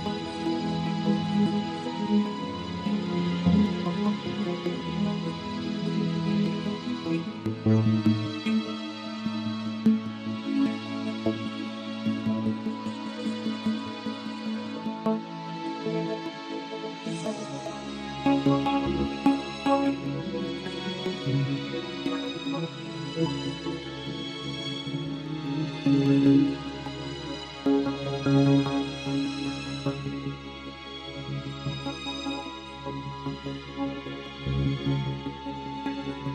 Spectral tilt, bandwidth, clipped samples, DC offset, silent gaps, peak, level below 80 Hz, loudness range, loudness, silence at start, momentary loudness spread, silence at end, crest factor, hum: -6.5 dB/octave; 9.8 kHz; under 0.1%; under 0.1%; none; -10 dBFS; -52 dBFS; 6 LU; -29 LUFS; 0 s; 11 LU; 0 s; 18 dB; none